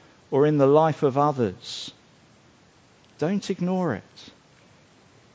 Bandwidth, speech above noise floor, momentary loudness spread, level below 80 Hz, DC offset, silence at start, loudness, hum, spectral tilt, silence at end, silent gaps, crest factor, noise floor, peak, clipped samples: 8 kHz; 34 dB; 16 LU; -64 dBFS; under 0.1%; 0.3 s; -23 LUFS; none; -7 dB/octave; 1.05 s; none; 20 dB; -56 dBFS; -4 dBFS; under 0.1%